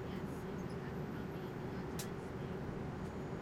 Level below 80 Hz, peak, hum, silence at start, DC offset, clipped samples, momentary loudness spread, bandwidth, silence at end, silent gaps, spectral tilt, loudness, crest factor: -58 dBFS; -28 dBFS; none; 0 s; under 0.1%; under 0.1%; 1 LU; 16 kHz; 0 s; none; -6.5 dB/octave; -44 LUFS; 16 dB